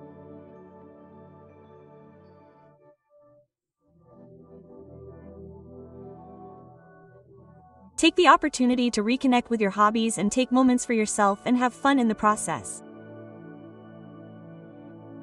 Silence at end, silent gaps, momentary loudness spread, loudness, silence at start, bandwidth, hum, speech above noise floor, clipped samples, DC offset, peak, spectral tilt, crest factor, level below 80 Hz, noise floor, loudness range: 0 s; none; 25 LU; -23 LUFS; 0 s; 12 kHz; none; 49 dB; under 0.1%; under 0.1%; -4 dBFS; -4 dB/octave; 24 dB; -60 dBFS; -71 dBFS; 7 LU